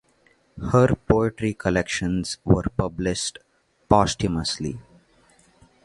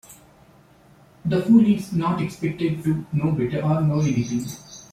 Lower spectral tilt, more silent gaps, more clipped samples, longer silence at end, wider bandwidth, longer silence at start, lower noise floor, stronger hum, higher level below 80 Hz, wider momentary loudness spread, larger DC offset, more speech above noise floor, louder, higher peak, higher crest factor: second, -5.5 dB/octave vs -7.5 dB/octave; neither; neither; first, 1.05 s vs 0.1 s; second, 11.5 kHz vs 15.5 kHz; first, 0.55 s vs 0.1 s; first, -61 dBFS vs -52 dBFS; neither; first, -40 dBFS vs -54 dBFS; about the same, 10 LU vs 11 LU; neither; first, 39 dB vs 32 dB; about the same, -23 LUFS vs -22 LUFS; first, 0 dBFS vs -4 dBFS; first, 24 dB vs 18 dB